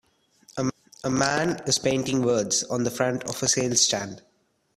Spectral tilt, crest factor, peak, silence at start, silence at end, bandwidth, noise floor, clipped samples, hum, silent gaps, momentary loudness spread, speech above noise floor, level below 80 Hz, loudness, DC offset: -3 dB/octave; 20 dB; -6 dBFS; 0.55 s; 0.6 s; 15.5 kHz; -58 dBFS; under 0.1%; none; none; 9 LU; 34 dB; -60 dBFS; -24 LUFS; under 0.1%